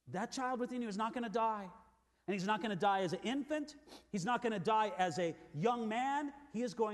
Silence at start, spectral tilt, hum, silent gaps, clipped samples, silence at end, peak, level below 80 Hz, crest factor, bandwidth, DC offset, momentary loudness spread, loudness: 0.05 s; -5 dB/octave; none; none; under 0.1%; 0 s; -20 dBFS; -74 dBFS; 18 dB; 12 kHz; under 0.1%; 9 LU; -37 LUFS